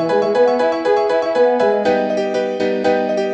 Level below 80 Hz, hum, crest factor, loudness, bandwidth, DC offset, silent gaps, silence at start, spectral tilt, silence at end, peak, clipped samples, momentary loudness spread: -56 dBFS; none; 12 dB; -16 LUFS; 8.4 kHz; under 0.1%; none; 0 s; -5.5 dB/octave; 0 s; -2 dBFS; under 0.1%; 4 LU